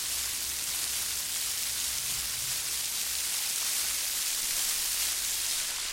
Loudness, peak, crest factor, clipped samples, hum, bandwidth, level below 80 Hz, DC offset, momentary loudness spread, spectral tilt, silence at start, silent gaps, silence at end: -28 LUFS; -12 dBFS; 20 dB; under 0.1%; none; 17 kHz; -56 dBFS; under 0.1%; 3 LU; 2 dB/octave; 0 s; none; 0 s